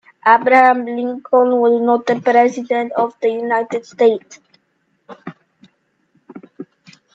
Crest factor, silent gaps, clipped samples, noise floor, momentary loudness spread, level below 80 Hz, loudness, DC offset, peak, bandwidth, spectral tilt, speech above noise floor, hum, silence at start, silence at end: 16 dB; none; under 0.1%; -65 dBFS; 24 LU; -70 dBFS; -15 LUFS; under 0.1%; 0 dBFS; 7.8 kHz; -5.5 dB/octave; 50 dB; none; 0.25 s; 0.5 s